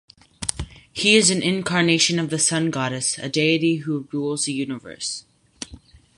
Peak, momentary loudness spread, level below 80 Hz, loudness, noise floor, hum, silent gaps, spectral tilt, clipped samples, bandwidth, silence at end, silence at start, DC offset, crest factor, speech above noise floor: 0 dBFS; 17 LU; -48 dBFS; -20 LUFS; -46 dBFS; none; none; -3 dB/octave; under 0.1%; 11.5 kHz; 0.4 s; 0.4 s; under 0.1%; 22 dB; 25 dB